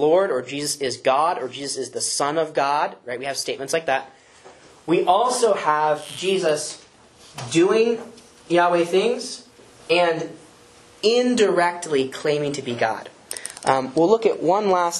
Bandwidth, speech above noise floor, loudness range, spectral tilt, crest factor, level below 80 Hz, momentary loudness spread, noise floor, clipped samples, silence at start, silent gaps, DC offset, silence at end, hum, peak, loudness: 12.5 kHz; 29 dB; 2 LU; -3.5 dB/octave; 20 dB; -68 dBFS; 12 LU; -49 dBFS; under 0.1%; 0 s; none; under 0.1%; 0 s; none; -2 dBFS; -21 LUFS